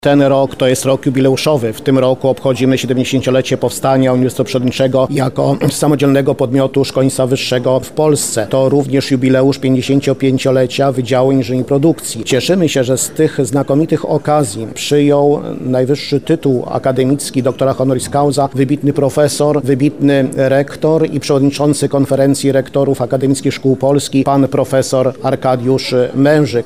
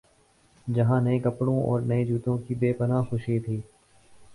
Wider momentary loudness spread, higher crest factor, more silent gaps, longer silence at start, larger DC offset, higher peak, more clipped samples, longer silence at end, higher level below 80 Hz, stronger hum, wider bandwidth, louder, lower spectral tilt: second, 3 LU vs 7 LU; about the same, 12 dB vs 16 dB; neither; second, 0.05 s vs 0.65 s; first, 1% vs under 0.1%; first, 0 dBFS vs -12 dBFS; neither; about the same, 0 s vs 0 s; first, -48 dBFS vs -56 dBFS; neither; first, 16 kHz vs 11 kHz; first, -13 LUFS vs -26 LUFS; second, -6 dB/octave vs -9.5 dB/octave